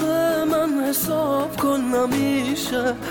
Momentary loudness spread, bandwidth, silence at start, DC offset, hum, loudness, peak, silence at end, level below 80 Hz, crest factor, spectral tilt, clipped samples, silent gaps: 2 LU; 17.5 kHz; 0 s; under 0.1%; none; -21 LUFS; -10 dBFS; 0 s; -52 dBFS; 10 dB; -4.5 dB/octave; under 0.1%; none